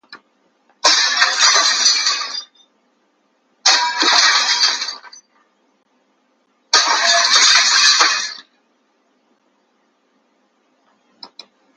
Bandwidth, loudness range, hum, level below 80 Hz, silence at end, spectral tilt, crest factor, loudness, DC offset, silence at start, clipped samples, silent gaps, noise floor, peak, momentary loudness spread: 11.5 kHz; 3 LU; none; -82 dBFS; 0.5 s; 4 dB/octave; 18 dB; -12 LUFS; under 0.1%; 0.1 s; under 0.1%; none; -62 dBFS; 0 dBFS; 14 LU